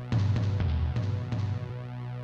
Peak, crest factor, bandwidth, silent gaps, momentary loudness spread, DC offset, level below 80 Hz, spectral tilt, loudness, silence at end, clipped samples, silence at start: -18 dBFS; 10 dB; 7 kHz; none; 10 LU; under 0.1%; -38 dBFS; -8 dB/octave; -30 LUFS; 0 s; under 0.1%; 0 s